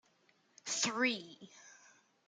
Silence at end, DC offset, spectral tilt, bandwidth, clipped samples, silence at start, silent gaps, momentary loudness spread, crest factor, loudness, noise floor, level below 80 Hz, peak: 0.55 s; under 0.1%; -1 dB/octave; 10 kHz; under 0.1%; 0.65 s; none; 23 LU; 22 dB; -35 LUFS; -73 dBFS; under -90 dBFS; -18 dBFS